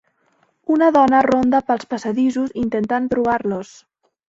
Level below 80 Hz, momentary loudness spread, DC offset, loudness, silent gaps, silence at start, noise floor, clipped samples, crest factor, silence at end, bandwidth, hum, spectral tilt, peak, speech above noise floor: -54 dBFS; 11 LU; under 0.1%; -18 LUFS; none; 0.7 s; -62 dBFS; under 0.1%; 16 dB; 0.65 s; 7.8 kHz; none; -6.5 dB/octave; -2 dBFS; 45 dB